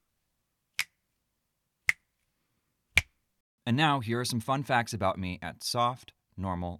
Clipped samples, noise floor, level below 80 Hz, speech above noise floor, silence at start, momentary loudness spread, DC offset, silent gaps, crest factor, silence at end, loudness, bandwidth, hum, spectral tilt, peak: under 0.1%; -81 dBFS; -56 dBFS; 51 dB; 0.8 s; 12 LU; under 0.1%; 3.40-3.58 s; 24 dB; 0 s; -30 LUFS; 19 kHz; none; -4.5 dB/octave; -8 dBFS